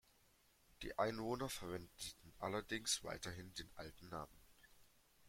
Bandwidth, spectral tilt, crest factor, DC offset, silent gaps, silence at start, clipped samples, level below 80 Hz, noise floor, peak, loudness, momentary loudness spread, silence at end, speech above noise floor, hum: 16.5 kHz; -3 dB/octave; 24 dB; under 0.1%; none; 0.8 s; under 0.1%; -66 dBFS; -74 dBFS; -24 dBFS; -46 LUFS; 12 LU; 0 s; 28 dB; none